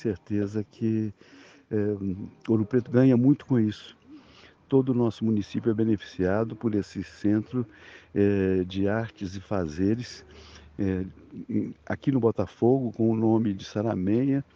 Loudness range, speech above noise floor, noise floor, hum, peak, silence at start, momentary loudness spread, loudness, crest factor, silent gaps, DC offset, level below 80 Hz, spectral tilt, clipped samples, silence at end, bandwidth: 4 LU; 28 dB; -54 dBFS; none; -8 dBFS; 0 s; 11 LU; -26 LUFS; 18 dB; none; under 0.1%; -58 dBFS; -8.5 dB/octave; under 0.1%; 0.15 s; 7.4 kHz